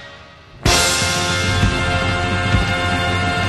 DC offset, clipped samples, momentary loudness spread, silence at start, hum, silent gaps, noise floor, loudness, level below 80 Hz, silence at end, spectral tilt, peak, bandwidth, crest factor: under 0.1%; under 0.1%; 4 LU; 0 s; none; none; -40 dBFS; -17 LUFS; -28 dBFS; 0 s; -3.5 dB/octave; 0 dBFS; 14.5 kHz; 18 dB